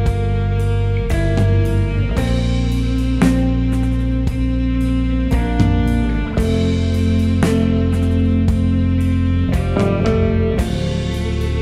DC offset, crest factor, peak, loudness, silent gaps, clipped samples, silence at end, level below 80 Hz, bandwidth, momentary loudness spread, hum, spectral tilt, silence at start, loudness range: 0.2%; 16 dB; 0 dBFS; -17 LUFS; none; under 0.1%; 0 s; -22 dBFS; 13 kHz; 4 LU; none; -7.5 dB/octave; 0 s; 1 LU